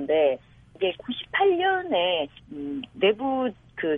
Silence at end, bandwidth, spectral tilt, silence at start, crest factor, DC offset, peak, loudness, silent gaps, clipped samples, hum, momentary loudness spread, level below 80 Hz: 0 s; 3.9 kHz; -7 dB/octave; 0 s; 16 dB; under 0.1%; -8 dBFS; -25 LUFS; none; under 0.1%; none; 12 LU; -60 dBFS